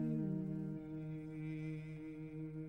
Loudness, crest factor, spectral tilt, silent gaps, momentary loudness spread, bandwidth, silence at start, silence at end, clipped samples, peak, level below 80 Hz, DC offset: -45 LUFS; 14 dB; -10 dB/octave; none; 9 LU; 5.4 kHz; 0 s; 0 s; under 0.1%; -30 dBFS; -68 dBFS; under 0.1%